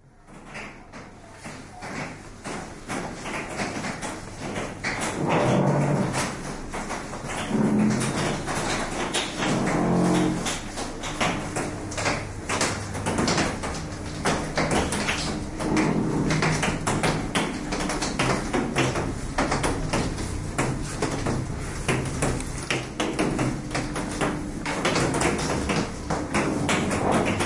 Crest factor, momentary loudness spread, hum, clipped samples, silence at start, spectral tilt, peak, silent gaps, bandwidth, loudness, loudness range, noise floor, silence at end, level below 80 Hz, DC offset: 18 dB; 11 LU; none; under 0.1%; 0.05 s; -4.5 dB/octave; -8 dBFS; none; 11.5 kHz; -26 LUFS; 5 LU; -46 dBFS; 0 s; -40 dBFS; under 0.1%